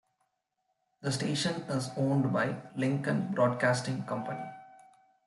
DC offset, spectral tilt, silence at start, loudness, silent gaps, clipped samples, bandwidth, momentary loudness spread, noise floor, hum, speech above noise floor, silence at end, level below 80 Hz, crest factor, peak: under 0.1%; -5.5 dB/octave; 1 s; -31 LUFS; none; under 0.1%; 12 kHz; 11 LU; -81 dBFS; none; 50 dB; 0.5 s; -72 dBFS; 18 dB; -16 dBFS